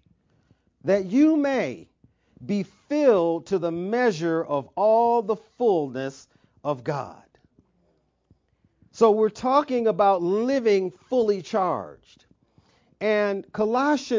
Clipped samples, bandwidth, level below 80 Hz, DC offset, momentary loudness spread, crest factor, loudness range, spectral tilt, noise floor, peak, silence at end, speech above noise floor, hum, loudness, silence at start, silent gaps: under 0.1%; 7.6 kHz; -66 dBFS; under 0.1%; 12 LU; 18 dB; 6 LU; -6.5 dB/octave; -68 dBFS; -6 dBFS; 0 s; 45 dB; none; -23 LUFS; 0.85 s; none